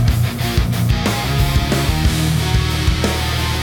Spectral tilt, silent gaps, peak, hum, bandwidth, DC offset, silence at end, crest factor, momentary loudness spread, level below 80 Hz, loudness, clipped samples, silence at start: -5 dB/octave; none; -4 dBFS; none; 19 kHz; under 0.1%; 0 s; 12 dB; 2 LU; -22 dBFS; -17 LUFS; under 0.1%; 0 s